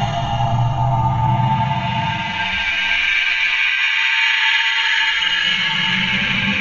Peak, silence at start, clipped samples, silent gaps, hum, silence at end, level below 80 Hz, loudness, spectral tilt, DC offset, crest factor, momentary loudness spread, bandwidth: -4 dBFS; 0 s; under 0.1%; none; none; 0 s; -36 dBFS; -16 LUFS; -4 dB/octave; under 0.1%; 14 dB; 6 LU; 7.6 kHz